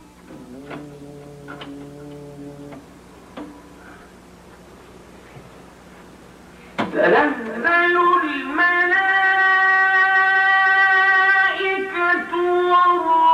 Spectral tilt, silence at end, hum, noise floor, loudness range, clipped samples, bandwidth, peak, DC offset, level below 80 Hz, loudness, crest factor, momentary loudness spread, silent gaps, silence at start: -4.5 dB/octave; 0 s; none; -44 dBFS; 23 LU; under 0.1%; 13 kHz; -4 dBFS; under 0.1%; -56 dBFS; -16 LUFS; 14 dB; 24 LU; none; 0.3 s